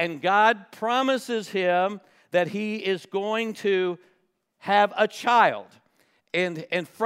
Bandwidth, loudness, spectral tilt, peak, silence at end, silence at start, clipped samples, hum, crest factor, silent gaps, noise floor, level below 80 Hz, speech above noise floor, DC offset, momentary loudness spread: 16 kHz; -24 LUFS; -4.5 dB/octave; -6 dBFS; 0 s; 0 s; under 0.1%; none; 20 dB; none; -69 dBFS; -84 dBFS; 46 dB; under 0.1%; 10 LU